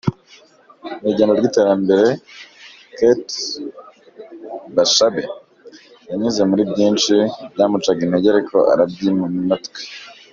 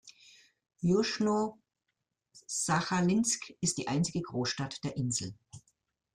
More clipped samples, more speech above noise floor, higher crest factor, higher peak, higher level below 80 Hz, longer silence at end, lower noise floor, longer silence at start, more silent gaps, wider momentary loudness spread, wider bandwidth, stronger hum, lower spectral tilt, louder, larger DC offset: neither; second, 32 dB vs 54 dB; about the same, 16 dB vs 18 dB; first, -2 dBFS vs -14 dBFS; first, -58 dBFS vs -66 dBFS; second, 0.2 s vs 0.55 s; second, -48 dBFS vs -85 dBFS; about the same, 0.05 s vs 0.05 s; neither; first, 19 LU vs 7 LU; second, 7.4 kHz vs 15 kHz; neither; about the same, -4.5 dB/octave vs -4.5 dB/octave; first, -17 LUFS vs -31 LUFS; neither